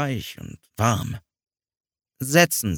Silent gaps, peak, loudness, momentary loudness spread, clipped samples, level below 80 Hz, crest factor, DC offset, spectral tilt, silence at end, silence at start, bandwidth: none; -2 dBFS; -21 LUFS; 21 LU; under 0.1%; -52 dBFS; 22 dB; under 0.1%; -4 dB/octave; 0 s; 0 s; 19.5 kHz